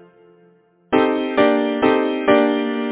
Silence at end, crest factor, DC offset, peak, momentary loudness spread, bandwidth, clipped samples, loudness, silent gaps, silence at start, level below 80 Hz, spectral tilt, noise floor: 0 s; 18 dB; under 0.1%; 0 dBFS; 3 LU; 4 kHz; under 0.1%; -17 LUFS; none; 0.9 s; -56 dBFS; -9 dB/octave; -54 dBFS